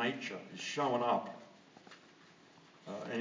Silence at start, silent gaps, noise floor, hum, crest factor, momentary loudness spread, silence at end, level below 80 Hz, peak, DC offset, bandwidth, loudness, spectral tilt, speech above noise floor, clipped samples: 0 s; none; -61 dBFS; none; 20 dB; 24 LU; 0 s; -90 dBFS; -20 dBFS; under 0.1%; 7.6 kHz; -37 LUFS; -4 dB/octave; 25 dB; under 0.1%